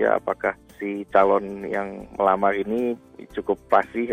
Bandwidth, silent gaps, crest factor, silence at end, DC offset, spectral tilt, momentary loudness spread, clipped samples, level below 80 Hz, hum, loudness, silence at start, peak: 15.5 kHz; none; 18 dB; 0 s; under 0.1%; -7 dB/octave; 12 LU; under 0.1%; -54 dBFS; none; -23 LUFS; 0 s; -4 dBFS